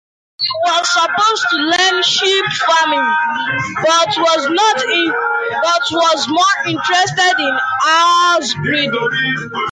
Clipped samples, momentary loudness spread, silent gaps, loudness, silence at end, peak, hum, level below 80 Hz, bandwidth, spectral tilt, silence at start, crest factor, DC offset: under 0.1%; 5 LU; none; -13 LUFS; 0 s; -2 dBFS; none; -56 dBFS; 9.6 kHz; -2 dB/octave; 0.4 s; 12 dB; under 0.1%